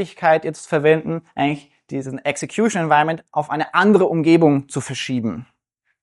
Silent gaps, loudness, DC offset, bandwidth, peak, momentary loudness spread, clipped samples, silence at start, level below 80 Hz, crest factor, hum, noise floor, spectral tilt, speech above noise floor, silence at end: none; -18 LUFS; under 0.1%; 11.5 kHz; -2 dBFS; 13 LU; under 0.1%; 0 s; -62 dBFS; 18 dB; none; -72 dBFS; -5.5 dB/octave; 54 dB; 0.6 s